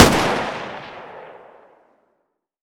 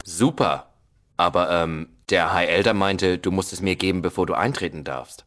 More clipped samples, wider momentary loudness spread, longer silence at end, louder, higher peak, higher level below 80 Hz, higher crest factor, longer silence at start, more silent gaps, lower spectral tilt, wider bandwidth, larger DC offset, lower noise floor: neither; first, 23 LU vs 10 LU; first, 1.3 s vs 0.1 s; about the same, -20 LUFS vs -22 LUFS; about the same, 0 dBFS vs -2 dBFS; first, -40 dBFS vs -50 dBFS; about the same, 22 dB vs 20 dB; about the same, 0 s vs 0.05 s; neither; about the same, -4 dB/octave vs -5 dB/octave; first, over 20 kHz vs 11 kHz; neither; first, -72 dBFS vs -60 dBFS